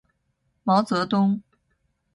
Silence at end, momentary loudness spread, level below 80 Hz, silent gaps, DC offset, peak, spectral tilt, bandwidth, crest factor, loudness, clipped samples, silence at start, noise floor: 0.75 s; 10 LU; -66 dBFS; none; under 0.1%; -8 dBFS; -7 dB/octave; 11.5 kHz; 16 dB; -23 LUFS; under 0.1%; 0.65 s; -72 dBFS